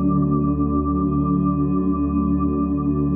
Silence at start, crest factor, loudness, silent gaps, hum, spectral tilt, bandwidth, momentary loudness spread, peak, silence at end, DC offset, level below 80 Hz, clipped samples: 0 s; 10 dB; -20 LUFS; none; none; -14 dB/octave; 2.6 kHz; 2 LU; -8 dBFS; 0 s; under 0.1%; -32 dBFS; under 0.1%